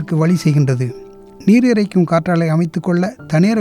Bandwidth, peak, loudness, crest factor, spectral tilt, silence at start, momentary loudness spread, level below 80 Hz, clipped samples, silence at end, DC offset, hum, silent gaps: 12.5 kHz; -2 dBFS; -15 LUFS; 12 dB; -7.5 dB/octave; 0 s; 8 LU; -52 dBFS; under 0.1%; 0 s; under 0.1%; none; none